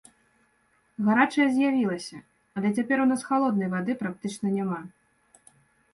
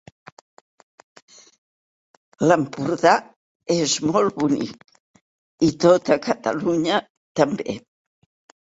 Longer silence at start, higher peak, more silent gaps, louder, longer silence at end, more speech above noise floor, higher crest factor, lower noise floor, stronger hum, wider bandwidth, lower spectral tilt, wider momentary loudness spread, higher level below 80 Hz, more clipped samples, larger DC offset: second, 1 s vs 2.4 s; second, -8 dBFS vs -2 dBFS; second, none vs 3.36-3.60 s, 5.00-5.14 s, 5.21-5.58 s, 7.10-7.35 s; second, -26 LUFS vs -21 LUFS; first, 1.05 s vs 0.85 s; second, 42 dB vs over 70 dB; about the same, 20 dB vs 22 dB; second, -67 dBFS vs under -90 dBFS; neither; first, 11.5 kHz vs 8 kHz; first, -6 dB/octave vs -4.5 dB/octave; about the same, 13 LU vs 11 LU; second, -70 dBFS vs -60 dBFS; neither; neither